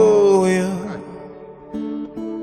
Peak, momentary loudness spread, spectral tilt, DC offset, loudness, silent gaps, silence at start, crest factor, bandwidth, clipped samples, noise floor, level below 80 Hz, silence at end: -4 dBFS; 23 LU; -6.5 dB/octave; under 0.1%; -19 LUFS; none; 0 s; 14 dB; 11.5 kHz; under 0.1%; -38 dBFS; -54 dBFS; 0 s